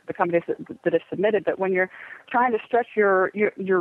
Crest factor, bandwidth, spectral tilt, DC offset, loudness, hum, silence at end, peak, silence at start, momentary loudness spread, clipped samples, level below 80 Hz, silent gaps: 18 dB; 4.1 kHz; -8.5 dB/octave; under 0.1%; -23 LUFS; none; 0 s; -6 dBFS; 0.1 s; 7 LU; under 0.1%; -72 dBFS; none